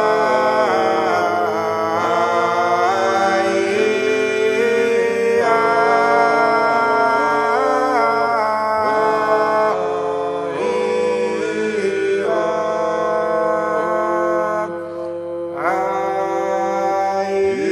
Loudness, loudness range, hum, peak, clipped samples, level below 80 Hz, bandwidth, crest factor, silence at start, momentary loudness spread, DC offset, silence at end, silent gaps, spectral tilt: -17 LUFS; 5 LU; none; -2 dBFS; under 0.1%; -64 dBFS; 13.5 kHz; 16 dB; 0 s; 5 LU; under 0.1%; 0 s; none; -4.5 dB/octave